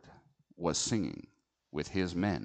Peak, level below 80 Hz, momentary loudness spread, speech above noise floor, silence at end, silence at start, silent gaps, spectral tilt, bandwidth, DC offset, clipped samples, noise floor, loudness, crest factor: -16 dBFS; -58 dBFS; 11 LU; 28 dB; 0 s; 0.05 s; none; -4.5 dB/octave; 9.2 kHz; under 0.1%; under 0.1%; -61 dBFS; -34 LUFS; 20 dB